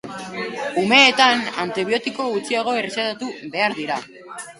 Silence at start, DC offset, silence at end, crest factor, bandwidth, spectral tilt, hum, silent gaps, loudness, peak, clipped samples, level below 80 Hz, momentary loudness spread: 0.05 s; under 0.1%; 0.05 s; 20 dB; 11.5 kHz; -3 dB/octave; none; none; -19 LUFS; 0 dBFS; under 0.1%; -66 dBFS; 16 LU